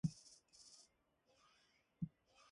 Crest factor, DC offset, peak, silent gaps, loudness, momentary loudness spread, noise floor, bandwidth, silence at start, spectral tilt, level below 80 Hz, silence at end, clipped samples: 26 dB; under 0.1%; -28 dBFS; none; -53 LUFS; 14 LU; -80 dBFS; 11.5 kHz; 0.05 s; -6 dB/octave; -76 dBFS; 0.45 s; under 0.1%